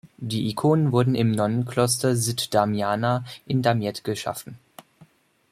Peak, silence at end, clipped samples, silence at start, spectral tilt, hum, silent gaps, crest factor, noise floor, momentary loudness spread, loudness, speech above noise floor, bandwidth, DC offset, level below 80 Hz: -6 dBFS; 0.45 s; under 0.1%; 0.05 s; -5.5 dB/octave; none; none; 18 dB; -56 dBFS; 8 LU; -23 LUFS; 33 dB; 15.5 kHz; under 0.1%; -60 dBFS